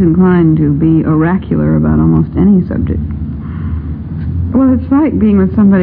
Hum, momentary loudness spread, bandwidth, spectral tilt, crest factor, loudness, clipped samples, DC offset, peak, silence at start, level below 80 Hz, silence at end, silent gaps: none; 11 LU; 3.4 kHz; -13.5 dB/octave; 10 dB; -11 LUFS; under 0.1%; under 0.1%; 0 dBFS; 0 s; -24 dBFS; 0 s; none